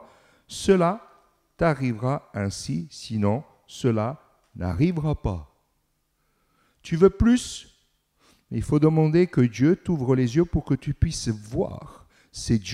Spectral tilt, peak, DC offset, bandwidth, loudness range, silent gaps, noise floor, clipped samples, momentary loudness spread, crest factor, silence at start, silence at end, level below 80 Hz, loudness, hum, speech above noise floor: -7 dB/octave; -4 dBFS; under 0.1%; 13 kHz; 5 LU; none; -71 dBFS; under 0.1%; 15 LU; 20 dB; 0 s; 0 s; -42 dBFS; -24 LUFS; none; 49 dB